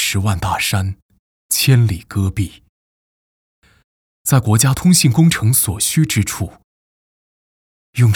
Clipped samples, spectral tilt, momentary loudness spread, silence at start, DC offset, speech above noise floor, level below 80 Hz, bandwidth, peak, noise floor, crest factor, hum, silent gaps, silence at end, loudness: under 0.1%; -4.5 dB/octave; 14 LU; 0 s; under 0.1%; over 75 dB; -40 dBFS; over 20 kHz; 0 dBFS; under -90 dBFS; 16 dB; none; 1.02-1.09 s, 1.19-1.49 s, 2.69-3.62 s, 3.84-4.25 s, 6.64-7.93 s; 0 s; -15 LUFS